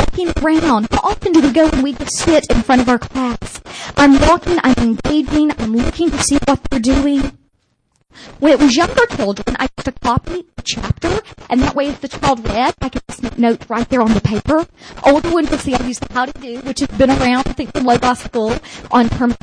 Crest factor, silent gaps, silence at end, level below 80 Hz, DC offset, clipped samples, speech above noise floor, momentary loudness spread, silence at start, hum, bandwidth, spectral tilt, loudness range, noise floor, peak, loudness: 12 dB; none; 0.05 s; -28 dBFS; under 0.1%; under 0.1%; 48 dB; 9 LU; 0 s; none; 10.5 kHz; -5 dB/octave; 4 LU; -62 dBFS; -2 dBFS; -15 LUFS